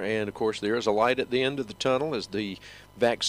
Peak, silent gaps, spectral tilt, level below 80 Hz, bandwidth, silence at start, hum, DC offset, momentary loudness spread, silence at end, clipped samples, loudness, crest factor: -10 dBFS; none; -4 dB/octave; -60 dBFS; 15.5 kHz; 0 s; none; under 0.1%; 9 LU; 0 s; under 0.1%; -27 LUFS; 16 dB